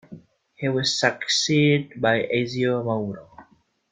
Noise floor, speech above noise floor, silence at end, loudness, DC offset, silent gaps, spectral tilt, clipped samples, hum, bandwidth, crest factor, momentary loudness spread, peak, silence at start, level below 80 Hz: -57 dBFS; 35 dB; 0.5 s; -22 LUFS; under 0.1%; none; -4.5 dB/octave; under 0.1%; none; 9.4 kHz; 20 dB; 10 LU; -4 dBFS; 0.1 s; -62 dBFS